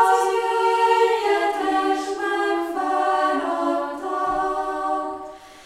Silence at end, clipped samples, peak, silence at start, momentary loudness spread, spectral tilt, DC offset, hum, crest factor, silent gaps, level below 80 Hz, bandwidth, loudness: 0 s; under 0.1%; -4 dBFS; 0 s; 8 LU; -2.5 dB/octave; under 0.1%; none; 16 dB; none; -56 dBFS; 15.5 kHz; -22 LUFS